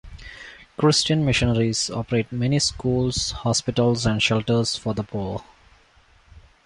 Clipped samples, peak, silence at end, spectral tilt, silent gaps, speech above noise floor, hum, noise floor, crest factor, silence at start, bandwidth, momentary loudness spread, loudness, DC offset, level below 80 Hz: under 0.1%; -6 dBFS; 0.25 s; -4.5 dB/octave; none; 34 dB; none; -56 dBFS; 18 dB; 0.05 s; 11.5 kHz; 15 LU; -22 LUFS; under 0.1%; -42 dBFS